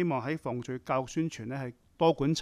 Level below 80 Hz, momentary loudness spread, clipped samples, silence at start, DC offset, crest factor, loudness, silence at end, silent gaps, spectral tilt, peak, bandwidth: -60 dBFS; 11 LU; under 0.1%; 0 s; under 0.1%; 18 dB; -32 LUFS; 0 s; none; -6 dB/octave; -12 dBFS; 13 kHz